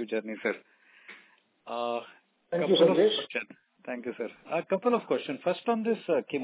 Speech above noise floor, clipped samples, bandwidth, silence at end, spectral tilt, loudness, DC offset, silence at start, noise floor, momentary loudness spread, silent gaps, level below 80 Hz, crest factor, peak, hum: 33 dB; under 0.1%; 4 kHz; 0 s; -9 dB/octave; -29 LUFS; under 0.1%; 0 s; -61 dBFS; 18 LU; none; -88 dBFS; 20 dB; -10 dBFS; none